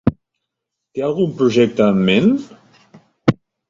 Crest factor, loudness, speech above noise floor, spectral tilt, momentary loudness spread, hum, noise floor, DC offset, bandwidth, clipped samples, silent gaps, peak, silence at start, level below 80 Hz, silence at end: 16 dB; -17 LUFS; 64 dB; -7 dB/octave; 9 LU; none; -79 dBFS; under 0.1%; 7.6 kHz; under 0.1%; none; -2 dBFS; 0.05 s; -46 dBFS; 0.35 s